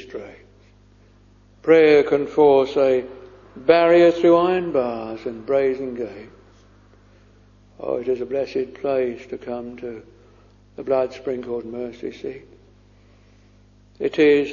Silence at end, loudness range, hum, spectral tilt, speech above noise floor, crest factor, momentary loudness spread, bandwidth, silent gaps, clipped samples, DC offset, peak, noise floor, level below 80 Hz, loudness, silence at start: 0 s; 12 LU; 50 Hz at -50 dBFS; -6.5 dB/octave; 33 dB; 20 dB; 20 LU; 7.2 kHz; none; under 0.1%; under 0.1%; 0 dBFS; -52 dBFS; -56 dBFS; -20 LUFS; 0 s